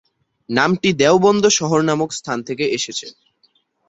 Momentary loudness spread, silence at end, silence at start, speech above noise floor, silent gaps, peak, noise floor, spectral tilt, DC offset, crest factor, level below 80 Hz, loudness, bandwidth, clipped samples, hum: 12 LU; 0.8 s; 0.5 s; 44 dB; none; -2 dBFS; -61 dBFS; -4 dB/octave; under 0.1%; 16 dB; -58 dBFS; -17 LUFS; 8 kHz; under 0.1%; none